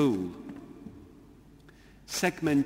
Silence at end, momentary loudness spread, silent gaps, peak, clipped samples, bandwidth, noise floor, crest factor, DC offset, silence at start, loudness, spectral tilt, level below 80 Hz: 0 s; 25 LU; none; -12 dBFS; under 0.1%; 16 kHz; -55 dBFS; 20 dB; under 0.1%; 0 s; -31 LUFS; -5 dB/octave; -60 dBFS